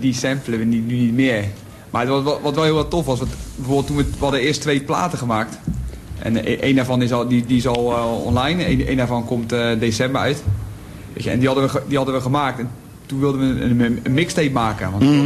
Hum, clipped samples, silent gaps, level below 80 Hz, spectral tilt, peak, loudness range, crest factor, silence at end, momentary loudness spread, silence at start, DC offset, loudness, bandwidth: none; under 0.1%; none; -36 dBFS; -6 dB/octave; -4 dBFS; 2 LU; 14 dB; 0 s; 10 LU; 0 s; under 0.1%; -19 LUFS; 13 kHz